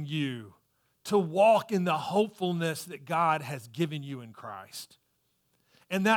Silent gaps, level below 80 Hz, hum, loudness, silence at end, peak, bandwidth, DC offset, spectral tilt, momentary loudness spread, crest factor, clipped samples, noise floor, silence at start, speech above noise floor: none; -78 dBFS; none; -29 LUFS; 0 s; -12 dBFS; 19 kHz; under 0.1%; -5.5 dB/octave; 20 LU; 18 dB; under 0.1%; -74 dBFS; 0 s; 45 dB